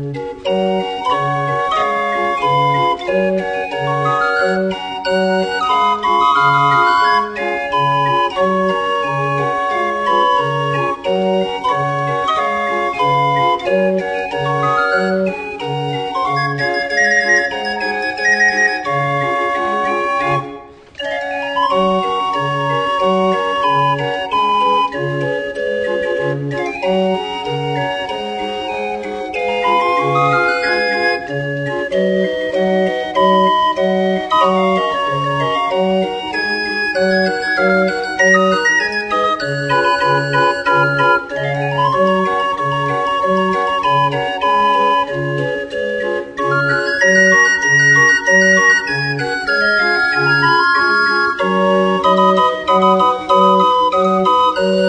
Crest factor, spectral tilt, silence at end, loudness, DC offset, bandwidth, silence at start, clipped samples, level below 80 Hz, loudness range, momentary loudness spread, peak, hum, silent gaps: 14 dB; -5 dB/octave; 0 s; -15 LUFS; under 0.1%; 10 kHz; 0 s; under 0.1%; -50 dBFS; 5 LU; 8 LU; 0 dBFS; none; none